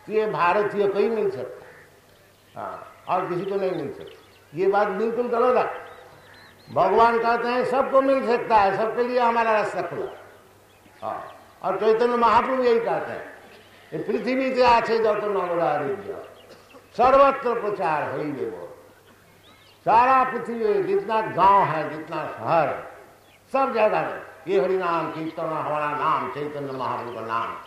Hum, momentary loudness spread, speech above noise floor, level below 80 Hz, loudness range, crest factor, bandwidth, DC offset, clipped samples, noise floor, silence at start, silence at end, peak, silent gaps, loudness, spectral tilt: none; 17 LU; 32 dB; -58 dBFS; 5 LU; 18 dB; 14 kHz; under 0.1%; under 0.1%; -54 dBFS; 0.05 s; 0 s; -6 dBFS; none; -22 LUFS; -6 dB/octave